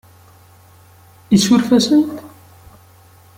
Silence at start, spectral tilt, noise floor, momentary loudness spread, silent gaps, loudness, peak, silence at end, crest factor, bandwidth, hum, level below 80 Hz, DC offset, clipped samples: 1.3 s; -5 dB/octave; -46 dBFS; 11 LU; none; -14 LUFS; -2 dBFS; 1.1 s; 16 dB; 16.5 kHz; none; -54 dBFS; under 0.1%; under 0.1%